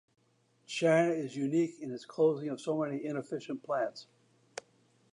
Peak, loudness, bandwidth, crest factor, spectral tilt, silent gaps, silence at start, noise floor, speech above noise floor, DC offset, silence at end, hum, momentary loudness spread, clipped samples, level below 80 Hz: -16 dBFS; -33 LUFS; 11 kHz; 18 dB; -6 dB/octave; none; 0.7 s; -71 dBFS; 39 dB; under 0.1%; 1.1 s; none; 20 LU; under 0.1%; -86 dBFS